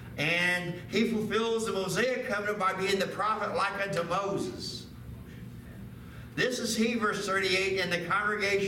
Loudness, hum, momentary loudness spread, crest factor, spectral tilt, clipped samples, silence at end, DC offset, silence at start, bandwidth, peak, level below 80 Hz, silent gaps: -29 LUFS; none; 18 LU; 16 dB; -4 dB/octave; under 0.1%; 0 s; under 0.1%; 0 s; 17 kHz; -14 dBFS; -56 dBFS; none